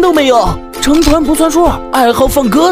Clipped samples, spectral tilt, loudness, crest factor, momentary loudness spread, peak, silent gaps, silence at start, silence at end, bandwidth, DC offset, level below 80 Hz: 0.4%; -4.5 dB/octave; -10 LUFS; 10 dB; 3 LU; 0 dBFS; none; 0 s; 0 s; 16.5 kHz; under 0.1%; -22 dBFS